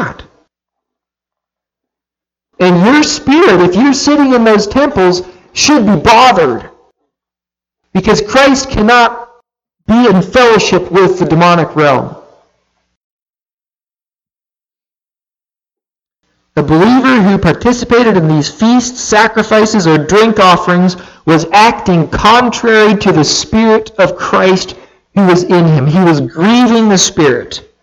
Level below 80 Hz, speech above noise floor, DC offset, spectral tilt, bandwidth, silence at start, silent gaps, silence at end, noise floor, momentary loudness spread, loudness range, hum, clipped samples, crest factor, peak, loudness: -36 dBFS; over 82 dB; under 0.1%; -5 dB/octave; 12 kHz; 0 s; 12.97-13.26 s, 13.53-13.57 s; 0.25 s; under -90 dBFS; 6 LU; 5 LU; none; under 0.1%; 10 dB; 0 dBFS; -8 LUFS